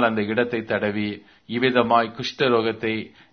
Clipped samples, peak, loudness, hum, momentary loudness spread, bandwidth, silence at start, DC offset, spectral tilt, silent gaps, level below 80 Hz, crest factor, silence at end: under 0.1%; -2 dBFS; -22 LUFS; none; 11 LU; 6.6 kHz; 0 s; under 0.1%; -6 dB/octave; none; -60 dBFS; 20 dB; 0.25 s